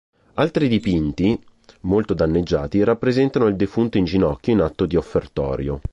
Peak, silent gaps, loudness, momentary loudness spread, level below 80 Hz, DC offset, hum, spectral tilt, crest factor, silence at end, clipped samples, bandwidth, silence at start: -6 dBFS; none; -20 LUFS; 6 LU; -36 dBFS; under 0.1%; none; -8 dB/octave; 14 dB; 0 s; under 0.1%; 8.2 kHz; 0.35 s